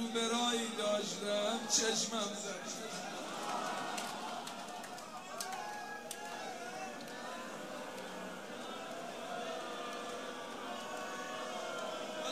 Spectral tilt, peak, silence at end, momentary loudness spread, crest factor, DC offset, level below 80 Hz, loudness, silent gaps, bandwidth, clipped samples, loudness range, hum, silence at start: -1.5 dB/octave; -18 dBFS; 0 s; 12 LU; 22 dB; under 0.1%; -82 dBFS; -39 LUFS; none; 15.5 kHz; under 0.1%; 8 LU; none; 0 s